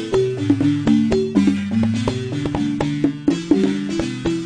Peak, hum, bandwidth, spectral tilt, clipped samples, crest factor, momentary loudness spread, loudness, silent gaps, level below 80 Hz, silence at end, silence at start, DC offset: -2 dBFS; none; 10 kHz; -7 dB/octave; under 0.1%; 16 dB; 6 LU; -19 LUFS; none; -40 dBFS; 0 s; 0 s; under 0.1%